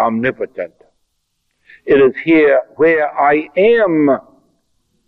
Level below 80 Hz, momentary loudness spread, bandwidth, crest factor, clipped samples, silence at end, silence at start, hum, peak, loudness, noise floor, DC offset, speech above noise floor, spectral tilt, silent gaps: -54 dBFS; 13 LU; 4.5 kHz; 12 dB; under 0.1%; 0.9 s; 0 s; none; -2 dBFS; -13 LUFS; -68 dBFS; under 0.1%; 55 dB; -8.5 dB/octave; none